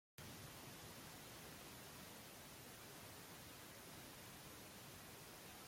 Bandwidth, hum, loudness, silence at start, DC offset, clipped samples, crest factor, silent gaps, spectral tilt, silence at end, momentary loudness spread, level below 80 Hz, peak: 16.5 kHz; none; -56 LUFS; 0.2 s; under 0.1%; under 0.1%; 22 dB; none; -3 dB/octave; 0 s; 1 LU; -76 dBFS; -36 dBFS